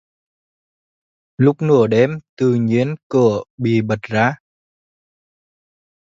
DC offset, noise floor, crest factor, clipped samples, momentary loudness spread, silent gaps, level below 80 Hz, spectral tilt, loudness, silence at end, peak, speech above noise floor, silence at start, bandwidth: under 0.1%; under -90 dBFS; 18 dB; under 0.1%; 6 LU; 2.29-2.37 s, 3.03-3.10 s, 3.50-3.58 s; -56 dBFS; -8 dB/octave; -17 LUFS; 1.8 s; 0 dBFS; over 74 dB; 1.4 s; 7.6 kHz